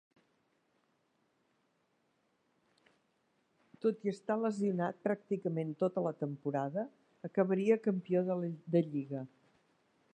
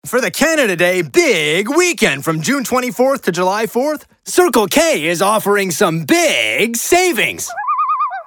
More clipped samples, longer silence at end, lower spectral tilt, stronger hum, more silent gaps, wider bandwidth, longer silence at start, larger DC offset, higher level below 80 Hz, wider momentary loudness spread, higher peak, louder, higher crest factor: neither; first, 0.9 s vs 0.05 s; first, -8.5 dB/octave vs -3 dB/octave; neither; neither; second, 9.4 kHz vs 18 kHz; first, 3.85 s vs 0.05 s; neither; second, -88 dBFS vs -52 dBFS; first, 9 LU vs 5 LU; second, -16 dBFS vs 0 dBFS; second, -35 LUFS vs -14 LUFS; first, 20 dB vs 14 dB